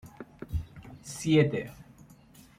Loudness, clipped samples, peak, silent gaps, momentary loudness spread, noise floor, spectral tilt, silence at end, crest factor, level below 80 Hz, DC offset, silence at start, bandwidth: -29 LUFS; under 0.1%; -10 dBFS; none; 22 LU; -55 dBFS; -6 dB/octave; 0.75 s; 22 dB; -48 dBFS; under 0.1%; 0.05 s; 16 kHz